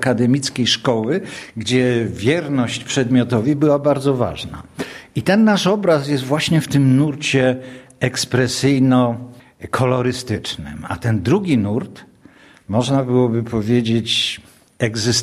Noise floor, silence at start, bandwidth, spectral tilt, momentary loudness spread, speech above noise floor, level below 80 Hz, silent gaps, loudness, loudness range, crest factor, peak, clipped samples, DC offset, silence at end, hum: -47 dBFS; 0 s; 14.5 kHz; -5.5 dB/octave; 12 LU; 30 dB; -48 dBFS; none; -18 LUFS; 4 LU; 16 dB; 0 dBFS; under 0.1%; under 0.1%; 0 s; none